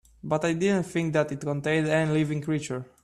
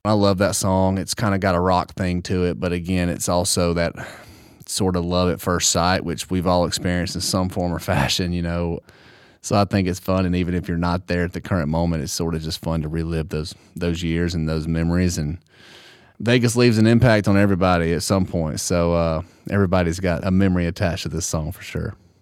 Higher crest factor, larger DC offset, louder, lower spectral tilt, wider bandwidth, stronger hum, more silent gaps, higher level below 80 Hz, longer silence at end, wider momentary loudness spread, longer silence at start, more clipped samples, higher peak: about the same, 14 dB vs 18 dB; neither; second, -26 LUFS vs -21 LUFS; first, -6.5 dB/octave vs -5 dB/octave; second, 12 kHz vs 16 kHz; neither; neither; second, -60 dBFS vs -38 dBFS; about the same, 0.2 s vs 0.3 s; second, 6 LU vs 9 LU; first, 0.25 s vs 0.05 s; neither; second, -12 dBFS vs -2 dBFS